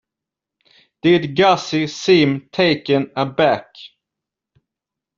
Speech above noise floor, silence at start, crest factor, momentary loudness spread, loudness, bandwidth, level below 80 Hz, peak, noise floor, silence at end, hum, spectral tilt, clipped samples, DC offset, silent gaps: 69 dB; 1.05 s; 18 dB; 7 LU; -17 LUFS; 7.6 kHz; -58 dBFS; -2 dBFS; -85 dBFS; 1.3 s; none; -4 dB/octave; under 0.1%; under 0.1%; none